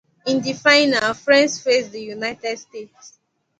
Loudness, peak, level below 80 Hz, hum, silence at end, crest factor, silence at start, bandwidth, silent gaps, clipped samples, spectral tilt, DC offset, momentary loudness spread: -18 LUFS; 0 dBFS; -64 dBFS; none; 0.5 s; 20 dB; 0.25 s; 9.4 kHz; none; under 0.1%; -2.5 dB/octave; under 0.1%; 17 LU